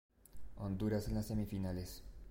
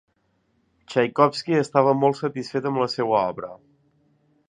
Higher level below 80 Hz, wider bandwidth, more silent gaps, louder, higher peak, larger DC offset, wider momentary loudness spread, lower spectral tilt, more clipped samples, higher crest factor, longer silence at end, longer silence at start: first, -52 dBFS vs -68 dBFS; first, 16.5 kHz vs 10 kHz; neither; second, -41 LUFS vs -22 LUFS; second, -26 dBFS vs -2 dBFS; neither; first, 17 LU vs 9 LU; about the same, -7 dB/octave vs -6.5 dB/octave; neither; second, 14 dB vs 22 dB; second, 0 s vs 0.9 s; second, 0.1 s vs 0.9 s